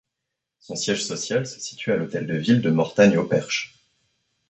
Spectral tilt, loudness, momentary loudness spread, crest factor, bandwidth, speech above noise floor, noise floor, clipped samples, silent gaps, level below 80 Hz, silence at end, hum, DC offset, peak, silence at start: -5 dB/octave; -22 LUFS; 12 LU; 20 dB; 8.4 kHz; 61 dB; -83 dBFS; under 0.1%; none; -62 dBFS; 0.85 s; none; under 0.1%; -4 dBFS; 0.7 s